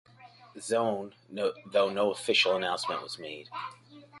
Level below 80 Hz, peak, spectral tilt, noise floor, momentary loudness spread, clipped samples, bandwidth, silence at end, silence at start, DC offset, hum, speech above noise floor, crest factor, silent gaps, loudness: -76 dBFS; -12 dBFS; -3 dB/octave; -54 dBFS; 17 LU; under 0.1%; 11.5 kHz; 0 s; 0.2 s; under 0.1%; none; 24 dB; 20 dB; none; -30 LUFS